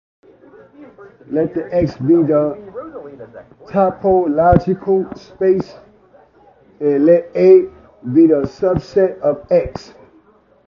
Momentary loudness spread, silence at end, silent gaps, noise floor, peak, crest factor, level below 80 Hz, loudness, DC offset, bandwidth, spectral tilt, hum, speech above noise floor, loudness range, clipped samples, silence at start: 19 LU; 0.85 s; none; -51 dBFS; 0 dBFS; 16 dB; -40 dBFS; -15 LUFS; under 0.1%; 6.8 kHz; -9.5 dB/octave; none; 36 dB; 5 LU; under 0.1%; 0.8 s